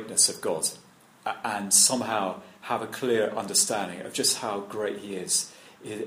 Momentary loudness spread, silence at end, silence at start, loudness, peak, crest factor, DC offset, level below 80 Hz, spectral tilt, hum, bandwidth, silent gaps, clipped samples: 15 LU; 0 s; 0 s; -25 LUFS; -6 dBFS; 22 dB; under 0.1%; -72 dBFS; -1 dB/octave; none; 15.5 kHz; none; under 0.1%